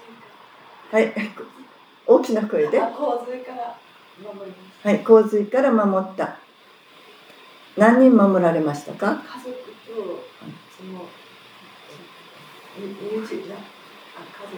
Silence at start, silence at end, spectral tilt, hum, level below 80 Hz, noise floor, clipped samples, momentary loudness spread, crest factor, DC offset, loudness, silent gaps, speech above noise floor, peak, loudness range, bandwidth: 0.1 s; 0 s; -7 dB/octave; none; -84 dBFS; -51 dBFS; under 0.1%; 26 LU; 22 dB; under 0.1%; -20 LUFS; none; 31 dB; -2 dBFS; 17 LU; 19.5 kHz